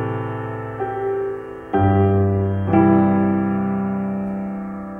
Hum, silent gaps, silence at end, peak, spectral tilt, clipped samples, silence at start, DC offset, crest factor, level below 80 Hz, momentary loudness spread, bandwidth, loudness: none; none; 0 s; -2 dBFS; -11 dB/octave; under 0.1%; 0 s; under 0.1%; 16 dB; -48 dBFS; 12 LU; 3.4 kHz; -20 LUFS